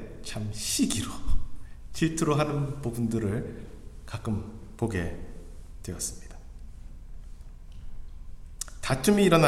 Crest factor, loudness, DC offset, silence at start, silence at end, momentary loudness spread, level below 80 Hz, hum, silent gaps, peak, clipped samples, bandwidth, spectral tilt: 24 dB; -30 LUFS; under 0.1%; 0 s; 0 s; 23 LU; -40 dBFS; none; none; -6 dBFS; under 0.1%; 15 kHz; -5 dB/octave